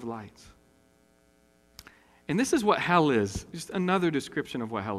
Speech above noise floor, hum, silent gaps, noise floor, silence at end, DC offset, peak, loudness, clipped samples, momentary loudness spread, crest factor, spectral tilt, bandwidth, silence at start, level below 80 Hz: 36 dB; none; none; -64 dBFS; 0 s; under 0.1%; -8 dBFS; -27 LUFS; under 0.1%; 16 LU; 22 dB; -5 dB/octave; 15 kHz; 0 s; -56 dBFS